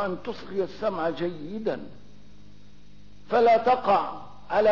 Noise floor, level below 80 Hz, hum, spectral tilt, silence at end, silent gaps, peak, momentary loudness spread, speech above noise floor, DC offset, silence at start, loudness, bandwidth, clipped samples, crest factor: -53 dBFS; -58 dBFS; 50 Hz at -55 dBFS; -6.5 dB/octave; 0 s; none; -12 dBFS; 15 LU; 28 dB; 0.9%; 0 s; -25 LUFS; 6 kHz; under 0.1%; 14 dB